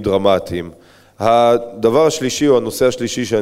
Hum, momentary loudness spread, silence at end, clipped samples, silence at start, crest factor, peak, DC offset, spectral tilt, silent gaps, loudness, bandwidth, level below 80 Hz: none; 9 LU; 0 s; under 0.1%; 0 s; 16 dB; 0 dBFS; under 0.1%; -4.5 dB/octave; none; -15 LUFS; 15.5 kHz; -46 dBFS